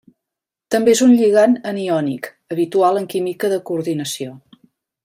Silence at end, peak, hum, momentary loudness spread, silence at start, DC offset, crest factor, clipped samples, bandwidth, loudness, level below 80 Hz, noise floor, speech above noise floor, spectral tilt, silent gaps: 0.65 s; -2 dBFS; none; 14 LU; 0.7 s; under 0.1%; 16 dB; under 0.1%; 16 kHz; -17 LUFS; -66 dBFS; -84 dBFS; 68 dB; -5 dB/octave; none